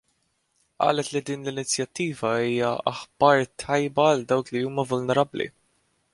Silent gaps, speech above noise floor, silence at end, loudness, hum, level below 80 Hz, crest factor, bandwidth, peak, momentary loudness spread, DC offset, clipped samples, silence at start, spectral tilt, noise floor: none; 47 dB; 0.65 s; -24 LUFS; none; -62 dBFS; 22 dB; 11.5 kHz; -4 dBFS; 9 LU; under 0.1%; under 0.1%; 0.8 s; -4.5 dB/octave; -71 dBFS